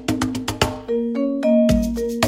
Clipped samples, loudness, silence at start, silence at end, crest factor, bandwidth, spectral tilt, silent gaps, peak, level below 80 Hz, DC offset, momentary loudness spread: under 0.1%; -20 LUFS; 0 s; 0 s; 18 dB; 16 kHz; -5.5 dB/octave; none; 0 dBFS; -34 dBFS; under 0.1%; 7 LU